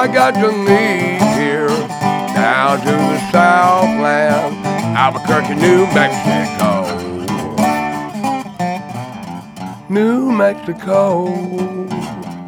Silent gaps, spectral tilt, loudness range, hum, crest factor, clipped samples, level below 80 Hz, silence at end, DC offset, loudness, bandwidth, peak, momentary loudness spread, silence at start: none; -5.5 dB/octave; 6 LU; none; 14 dB; under 0.1%; -52 dBFS; 0 s; under 0.1%; -14 LUFS; over 20 kHz; 0 dBFS; 12 LU; 0 s